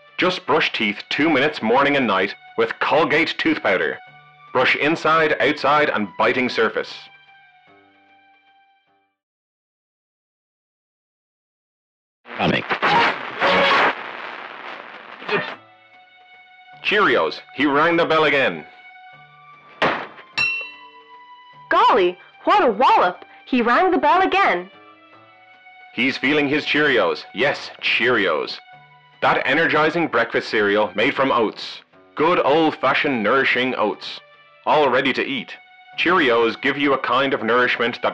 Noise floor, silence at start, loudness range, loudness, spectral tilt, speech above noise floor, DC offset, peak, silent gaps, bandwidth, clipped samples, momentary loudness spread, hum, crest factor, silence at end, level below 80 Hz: -64 dBFS; 0.2 s; 5 LU; -18 LUFS; -5 dB/octave; 45 dB; under 0.1%; -10 dBFS; 9.23-12.24 s; 9 kHz; under 0.1%; 15 LU; none; 10 dB; 0 s; -60 dBFS